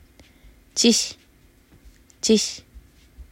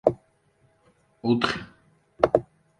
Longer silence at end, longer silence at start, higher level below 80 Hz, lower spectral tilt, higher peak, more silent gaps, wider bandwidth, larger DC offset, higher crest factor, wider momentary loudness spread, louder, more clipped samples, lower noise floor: second, 0.1 s vs 0.35 s; first, 0.75 s vs 0.05 s; about the same, -52 dBFS vs -56 dBFS; second, -2.5 dB/octave vs -6.5 dB/octave; about the same, -4 dBFS vs -2 dBFS; neither; first, 16 kHz vs 11 kHz; neither; about the same, 22 dB vs 26 dB; second, 12 LU vs 16 LU; first, -21 LUFS vs -25 LUFS; neither; second, -55 dBFS vs -65 dBFS